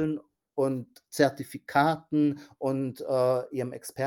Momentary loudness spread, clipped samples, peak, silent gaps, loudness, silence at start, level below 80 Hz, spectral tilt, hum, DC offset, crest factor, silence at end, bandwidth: 12 LU; under 0.1%; -8 dBFS; none; -28 LUFS; 0 s; -70 dBFS; -6 dB/octave; none; under 0.1%; 22 dB; 0 s; 17 kHz